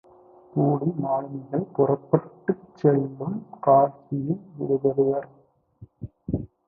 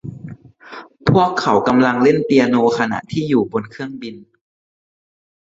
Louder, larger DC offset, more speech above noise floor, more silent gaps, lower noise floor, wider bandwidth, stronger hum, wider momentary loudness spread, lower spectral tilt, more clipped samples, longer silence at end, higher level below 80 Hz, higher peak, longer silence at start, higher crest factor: second, -25 LUFS vs -16 LUFS; neither; first, 28 dB vs 22 dB; neither; first, -52 dBFS vs -38 dBFS; second, 2.6 kHz vs 7.8 kHz; neither; second, 12 LU vs 22 LU; first, -12.5 dB/octave vs -7 dB/octave; neither; second, 0.2 s vs 1.35 s; about the same, -54 dBFS vs -50 dBFS; about the same, -2 dBFS vs -2 dBFS; first, 0.55 s vs 0.05 s; first, 22 dB vs 16 dB